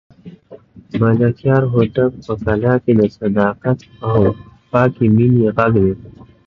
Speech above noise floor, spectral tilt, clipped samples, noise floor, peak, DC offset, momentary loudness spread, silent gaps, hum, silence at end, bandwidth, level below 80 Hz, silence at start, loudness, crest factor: 26 dB; -10.5 dB/octave; under 0.1%; -41 dBFS; 0 dBFS; under 0.1%; 7 LU; none; none; 0.35 s; 6 kHz; -40 dBFS; 0.25 s; -15 LUFS; 16 dB